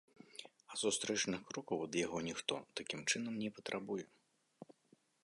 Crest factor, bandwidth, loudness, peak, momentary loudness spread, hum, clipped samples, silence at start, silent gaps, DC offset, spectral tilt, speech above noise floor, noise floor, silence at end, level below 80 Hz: 24 dB; 11.5 kHz; -40 LUFS; -18 dBFS; 19 LU; none; under 0.1%; 0.35 s; none; under 0.1%; -2.5 dB/octave; 33 dB; -73 dBFS; 0.6 s; -78 dBFS